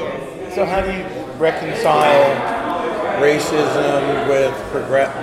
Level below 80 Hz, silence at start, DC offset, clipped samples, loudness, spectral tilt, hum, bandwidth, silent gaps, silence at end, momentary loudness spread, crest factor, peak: -44 dBFS; 0 s; under 0.1%; under 0.1%; -17 LUFS; -5 dB/octave; none; 15.5 kHz; none; 0 s; 11 LU; 16 dB; -2 dBFS